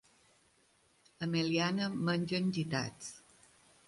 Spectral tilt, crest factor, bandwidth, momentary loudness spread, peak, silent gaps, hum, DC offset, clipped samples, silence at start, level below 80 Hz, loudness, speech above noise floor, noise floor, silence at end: -5.5 dB/octave; 18 dB; 11.5 kHz; 15 LU; -18 dBFS; none; none; under 0.1%; under 0.1%; 1.2 s; -72 dBFS; -34 LUFS; 36 dB; -70 dBFS; 0.7 s